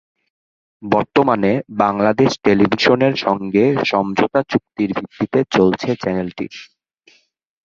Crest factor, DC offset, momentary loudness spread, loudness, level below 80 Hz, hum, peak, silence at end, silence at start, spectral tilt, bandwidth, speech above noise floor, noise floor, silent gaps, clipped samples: 16 dB; under 0.1%; 9 LU; -17 LUFS; -52 dBFS; none; 0 dBFS; 1 s; 0.8 s; -6.5 dB/octave; 7.4 kHz; 38 dB; -55 dBFS; none; under 0.1%